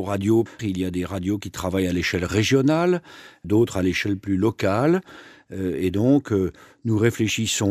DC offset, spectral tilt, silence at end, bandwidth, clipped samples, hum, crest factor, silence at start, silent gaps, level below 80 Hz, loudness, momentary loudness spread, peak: under 0.1%; -5.5 dB/octave; 0 s; 15 kHz; under 0.1%; none; 18 dB; 0 s; none; -50 dBFS; -22 LUFS; 8 LU; -4 dBFS